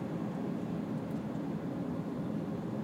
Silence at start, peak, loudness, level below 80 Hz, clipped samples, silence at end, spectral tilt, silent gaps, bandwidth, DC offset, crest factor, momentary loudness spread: 0 s; -26 dBFS; -37 LUFS; -64 dBFS; under 0.1%; 0 s; -8.5 dB/octave; none; 16 kHz; under 0.1%; 12 dB; 1 LU